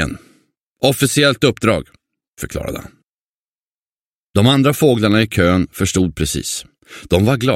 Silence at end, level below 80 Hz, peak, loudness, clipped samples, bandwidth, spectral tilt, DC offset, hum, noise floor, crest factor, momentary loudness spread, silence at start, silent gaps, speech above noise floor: 0 s; -38 dBFS; 0 dBFS; -16 LUFS; under 0.1%; 16.5 kHz; -5 dB/octave; under 0.1%; none; under -90 dBFS; 18 dB; 13 LU; 0 s; 0.61-0.74 s, 2.28-2.33 s, 3.09-4.34 s; over 75 dB